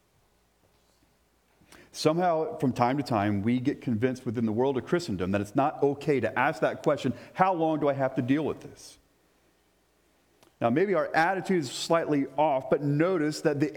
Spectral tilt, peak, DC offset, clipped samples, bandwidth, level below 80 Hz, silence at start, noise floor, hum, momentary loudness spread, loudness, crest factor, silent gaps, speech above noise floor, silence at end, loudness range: -6.5 dB/octave; -8 dBFS; under 0.1%; under 0.1%; 18 kHz; -68 dBFS; 1.95 s; -67 dBFS; none; 4 LU; -27 LUFS; 20 dB; none; 41 dB; 0 s; 4 LU